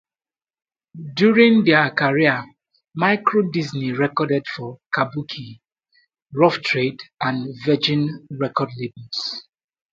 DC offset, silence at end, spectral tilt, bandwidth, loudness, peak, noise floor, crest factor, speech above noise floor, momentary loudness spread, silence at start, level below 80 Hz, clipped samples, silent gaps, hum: under 0.1%; 0.5 s; -6.5 dB/octave; 7.6 kHz; -20 LUFS; 0 dBFS; under -90 dBFS; 20 dB; over 70 dB; 17 LU; 0.95 s; -64 dBFS; under 0.1%; none; none